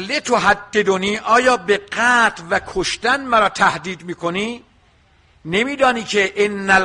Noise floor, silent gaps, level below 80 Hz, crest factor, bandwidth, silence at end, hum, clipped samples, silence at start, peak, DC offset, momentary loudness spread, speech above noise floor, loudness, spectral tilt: -54 dBFS; none; -48 dBFS; 16 dB; 11 kHz; 0 s; none; under 0.1%; 0 s; -2 dBFS; under 0.1%; 10 LU; 37 dB; -17 LUFS; -3.5 dB/octave